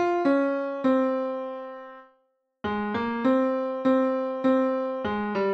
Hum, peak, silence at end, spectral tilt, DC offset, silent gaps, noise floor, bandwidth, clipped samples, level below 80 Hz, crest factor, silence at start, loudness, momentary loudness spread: none; -12 dBFS; 0 s; -7.5 dB/octave; under 0.1%; none; -71 dBFS; 6.2 kHz; under 0.1%; -62 dBFS; 14 dB; 0 s; -26 LUFS; 12 LU